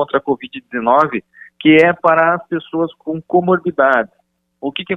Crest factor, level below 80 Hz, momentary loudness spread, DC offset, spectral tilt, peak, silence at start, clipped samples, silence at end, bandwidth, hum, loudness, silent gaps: 16 dB; -58 dBFS; 15 LU; under 0.1%; -7.5 dB/octave; 0 dBFS; 0 s; under 0.1%; 0 s; 6.4 kHz; none; -15 LUFS; none